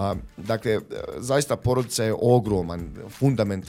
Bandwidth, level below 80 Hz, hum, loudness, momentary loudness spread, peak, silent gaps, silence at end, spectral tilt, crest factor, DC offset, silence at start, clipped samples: 16 kHz; -46 dBFS; none; -24 LUFS; 12 LU; -6 dBFS; none; 0 s; -6 dB/octave; 18 dB; under 0.1%; 0 s; under 0.1%